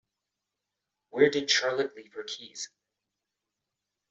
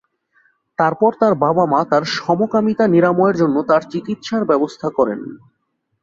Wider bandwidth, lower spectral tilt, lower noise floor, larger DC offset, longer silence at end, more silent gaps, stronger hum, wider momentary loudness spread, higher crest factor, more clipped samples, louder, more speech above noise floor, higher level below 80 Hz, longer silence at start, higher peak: about the same, 8 kHz vs 7.6 kHz; second, -2.5 dB/octave vs -7 dB/octave; first, -86 dBFS vs -70 dBFS; neither; first, 1.45 s vs 0.65 s; neither; neither; first, 16 LU vs 9 LU; first, 24 dB vs 16 dB; neither; second, -27 LUFS vs -16 LUFS; first, 58 dB vs 54 dB; second, -78 dBFS vs -60 dBFS; first, 1.15 s vs 0.8 s; second, -8 dBFS vs -2 dBFS